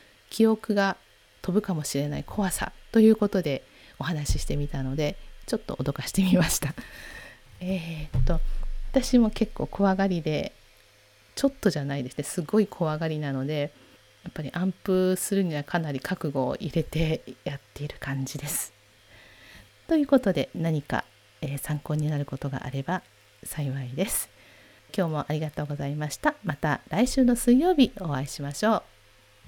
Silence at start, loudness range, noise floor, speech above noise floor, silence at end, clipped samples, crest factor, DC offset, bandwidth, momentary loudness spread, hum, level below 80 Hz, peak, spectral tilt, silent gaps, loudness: 0.3 s; 6 LU; -58 dBFS; 32 dB; 0.65 s; under 0.1%; 20 dB; under 0.1%; over 20 kHz; 14 LU; none; -38 dBFS; -6 dBFS; -5.5 dB/octave; none; -27 LUFS